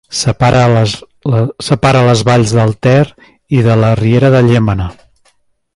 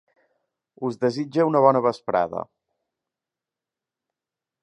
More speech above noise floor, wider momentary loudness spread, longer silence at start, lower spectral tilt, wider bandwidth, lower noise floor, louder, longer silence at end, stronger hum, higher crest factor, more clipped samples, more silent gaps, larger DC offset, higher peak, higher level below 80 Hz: second, 45 dB vs 67 dB; second, 8 LU vs 14 LU; second, 0.1 s vs 0.8 s; about the same, -6.5 dB/octave vs -7.5 dB/octave; first, 11.5 kHz vs 10 kHz; second, -55 dBFS vs -89 dBFS; first, -11 LUFS vs -22 LUFS; second, 0.85 s vs 2.2 s; neither; second, 10 dB vs 22 dB; neither; neither; neither; about the same, 0 dBFS vs -2 dBFS; first, -34 dBFS vs -68 dBFS